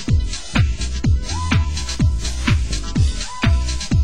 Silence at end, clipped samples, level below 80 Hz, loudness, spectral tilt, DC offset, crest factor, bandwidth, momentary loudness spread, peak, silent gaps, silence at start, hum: 0 s; under 0.1%; -20 dBFS; -20 LUFS; -5 dB/octave; 3%; 14 dB; 16 kHz; 3 LU; -4 dBFS; none; 0 s; none